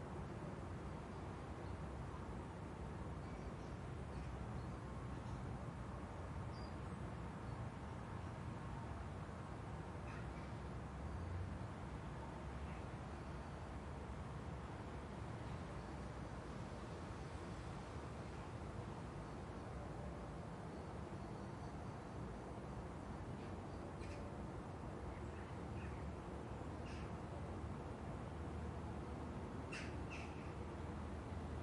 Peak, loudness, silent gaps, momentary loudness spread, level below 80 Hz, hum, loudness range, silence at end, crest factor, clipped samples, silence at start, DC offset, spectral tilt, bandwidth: -36 dBFS; -50 LUFS; none; 2 LU; -56 dBFS; none; 2 LU; 0 s; 12 dB; under 0.1%; 0 s; under 0.1%; -7 dB/octave; 11.5 kHz